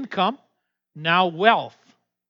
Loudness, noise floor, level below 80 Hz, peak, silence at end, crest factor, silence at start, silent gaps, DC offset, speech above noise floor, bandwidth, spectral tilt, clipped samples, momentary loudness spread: -21 LUFS; -74 dBFS; -88 dBFS; -2 dBFS; 0.6 s; 22 dB; 0 s; none; under 0.1%; 54 dB; 6.8 kHz; -6.5 dB/octave; under 0.1%; 18 LU